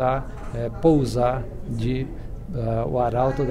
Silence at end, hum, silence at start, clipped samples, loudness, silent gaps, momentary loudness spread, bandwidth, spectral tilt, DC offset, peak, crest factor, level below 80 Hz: 0 s; none; 0 s; under 0.1%; -24 LUFS; none; 13 LU; 12.5 kHz; -8 dB/octave; under 0.1%; -6 dBFS; 16 dB; -34 dBFS